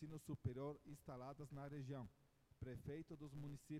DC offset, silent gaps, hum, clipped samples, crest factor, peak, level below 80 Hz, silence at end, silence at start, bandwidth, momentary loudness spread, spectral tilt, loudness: under 0.1%; none; none; under 0.1%; 20 dB; -34 dBFS; -70 dBFS; 0 s; 0 s; 15.5 kHz; 8 LU; -7.5 dB/octave; -54 LUFS